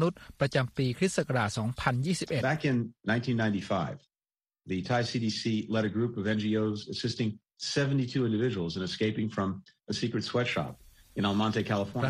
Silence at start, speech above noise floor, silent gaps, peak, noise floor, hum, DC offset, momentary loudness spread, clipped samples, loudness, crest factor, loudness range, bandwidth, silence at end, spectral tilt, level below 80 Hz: 0 s; over 60 dB; none; -10 dBFS; under -90 dBFS; none; under 0.1%; 6 LU; under 0.1%; -30 LUFS; 20 dB; 2 LU; 12.5 kHz; 0 s; -6 dB/octave; -60 dBFS